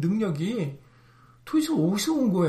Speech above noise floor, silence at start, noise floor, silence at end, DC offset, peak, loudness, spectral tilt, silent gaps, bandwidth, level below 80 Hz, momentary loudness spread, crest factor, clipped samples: 31 dB; 0 s; -55 dBFS; 0 s; under 0.1%; -12 dBFS; -26 LUFS; -6 dB/octave; none; 15 kHz; -64 dBFS; 7 LU; 14 dB; under 0.1%